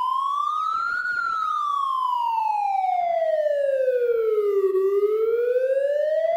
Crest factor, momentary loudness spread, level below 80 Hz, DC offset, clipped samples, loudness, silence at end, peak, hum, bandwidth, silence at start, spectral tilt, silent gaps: 10 dB; 2 LU; -72 dBFS; under 0.1%; under 0.1%; -23 LUFS; 0 s; -12 dBFS; none; 16 kHz; 0 s; -3.5 dB/octave; none